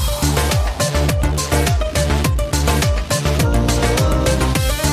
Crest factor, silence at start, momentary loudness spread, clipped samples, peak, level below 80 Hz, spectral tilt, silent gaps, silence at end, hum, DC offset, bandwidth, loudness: 12 dB; 0 s; 2 LU; under 0.1%; -4 dBFS; -20 dBFS; -4.5 dB/octave; none; 0 s; none; under 0.1%; 15.5 kHz; -17 LUFS